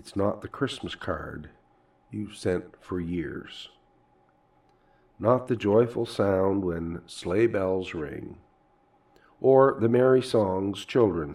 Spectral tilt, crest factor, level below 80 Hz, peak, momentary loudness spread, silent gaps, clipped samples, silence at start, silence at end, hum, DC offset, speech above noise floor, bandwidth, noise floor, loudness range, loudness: -7 dB/octave; 20 dB; -58 dBFS; -6 dBFS; 17 LU; none; under 0.1%; 0.05 s; 0 s; none; under 0.1%; 38 dB; 12 kHz; -64 dBFS; 11 LU; -26 LUFS